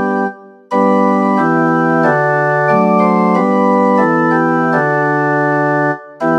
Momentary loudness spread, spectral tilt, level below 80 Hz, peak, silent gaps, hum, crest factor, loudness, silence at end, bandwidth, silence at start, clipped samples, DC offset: 5 LU; -8.5 dB/octave; -66 dBFS; 0 dBFS; none; none; 12 dB; -13 LUFS; 0 s; 9 kHz; 0 s; under 0.1%; under 0.1%